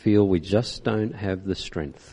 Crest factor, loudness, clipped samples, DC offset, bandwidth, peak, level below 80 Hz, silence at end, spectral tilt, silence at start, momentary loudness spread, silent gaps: 18 dB; -25 LUFS; under 0.1%; under 0.1%; 10.5 kHz; -6 dBFS; -44 dBFS; 0 s; -7 dB/octave; 0.05 s; 10 LU; none